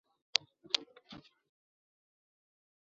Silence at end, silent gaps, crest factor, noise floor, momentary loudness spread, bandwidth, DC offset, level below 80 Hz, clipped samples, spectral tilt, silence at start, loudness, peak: 1.85 s; none; 40 dB; -56 dBFS; 20 LU; 7 kHz; under 0.1%; -84 dBFS; under 0.1%; 2 dB/octave; 1.1 s; -35 LUFS; -4 dBFS